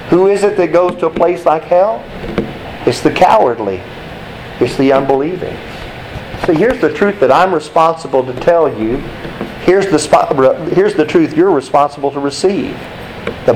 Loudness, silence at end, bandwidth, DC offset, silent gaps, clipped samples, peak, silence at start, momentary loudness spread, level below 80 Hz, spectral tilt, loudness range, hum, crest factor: -12 LUFS; 0 s; 14.5 kHz; under 0.1%; none; under 0.1%; 0 dBFS; 0 s; 15 LU; -38 dBFS; -6 dB/octave; 3 LU; none; 12 dB